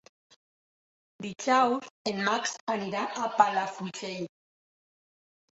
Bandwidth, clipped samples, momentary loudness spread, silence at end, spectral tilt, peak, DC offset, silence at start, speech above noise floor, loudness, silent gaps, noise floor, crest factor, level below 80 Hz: 8.2 kHz; under 0.1%; 14 LU; 1.35 s; -3.5 dB/octave; -6 dBFS; under 0.1%; 1.2 s; over 61 dB; -29 LUFS; 1.90-2.05 s, 2.61-2.67 s; under -90 dBFS; 26 dB; -76 dBFS